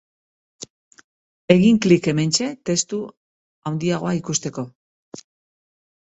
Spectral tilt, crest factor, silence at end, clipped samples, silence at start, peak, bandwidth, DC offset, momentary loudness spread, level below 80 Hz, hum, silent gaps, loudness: -5 dB/octave; 22 dB; 0.9 s; under 0.1%; 0.6 s; 0 dBFS; 8.2 kHz; under 0.1%; 24 LU; -58 dBFS; none; 0.70-0.91 s, 1.04-1.48 s, 3.17-3.62 s, 4.75-5.12 s; -20 LUFS